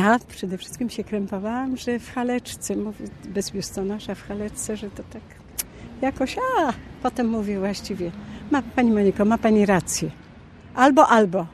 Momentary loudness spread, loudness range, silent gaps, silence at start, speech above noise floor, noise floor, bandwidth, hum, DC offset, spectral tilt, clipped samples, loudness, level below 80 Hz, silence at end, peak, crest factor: 14 LU; 9 LU; none; 0 s; 22 dB; -45 dBFS; 13 kHz; none; under 0.1%; -5 dB/octave; under 0.1%; -23 LUFS; -48 dBFS; 0 s; -2 dBFS; 22 dB